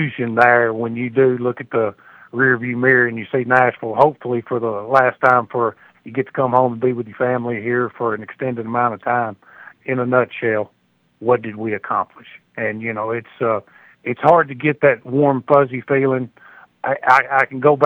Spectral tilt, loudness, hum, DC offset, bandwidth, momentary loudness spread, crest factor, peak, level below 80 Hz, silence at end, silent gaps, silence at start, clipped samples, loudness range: -8.5 dB/octave; -18 LUFS; none; under 0.1%; 7.6 kHz; 11 LU; 18 dB; 0 dBFS; -66 dBFS; 0 s; none; 0 s; under 0.1%; 5 LU